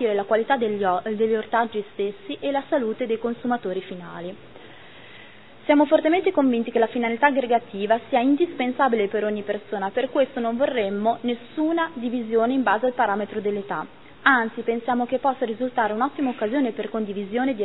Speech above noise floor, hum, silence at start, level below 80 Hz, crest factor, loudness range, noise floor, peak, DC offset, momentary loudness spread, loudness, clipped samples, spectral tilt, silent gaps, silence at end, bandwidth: 24 dB; none; 0 s; -64 dBFS; 20 dB; 5 LU; -47 dBFS; -2 dBFS; 0.4%; 9 LU; -23 LUFS; under 0.1%; -9.5 dB/octave; none; 0 s; 4.1 kHz